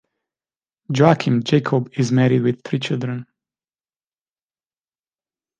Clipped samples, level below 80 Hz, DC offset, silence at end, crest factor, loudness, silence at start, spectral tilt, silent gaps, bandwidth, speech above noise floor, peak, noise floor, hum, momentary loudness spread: under 0.1%; -60 dBFS; under 0.1%; 2.35 s; 20 dB; -19 LUFS; 0.9 s; -7 dB/octave; none; 9.2 kHz; over 72 dB; -2 dBFS; under -90 dBFS; none; 10 LU